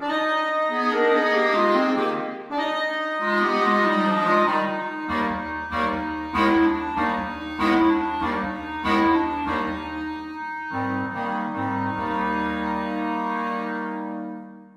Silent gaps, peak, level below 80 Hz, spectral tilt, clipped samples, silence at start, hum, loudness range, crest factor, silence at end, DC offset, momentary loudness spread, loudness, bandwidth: none; -8 dBFS; -50 dBFS; -6 dB/octave; under 0.1%; 0 s; none; 5 LU; 16 dB; 0.1 s; under 0.1%; 10 LU; -23 LUFS; 11 kHz